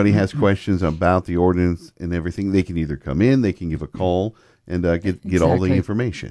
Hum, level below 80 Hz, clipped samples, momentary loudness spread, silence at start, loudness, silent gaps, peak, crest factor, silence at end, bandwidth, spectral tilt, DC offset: none; -38 dBFS; under 0.1%; 9 LU; 0 s; -20 LUFS; none; -2 dBFS; 16 dB; 0.05 s; 11 kHz; -8 dB/octave; under 0.1%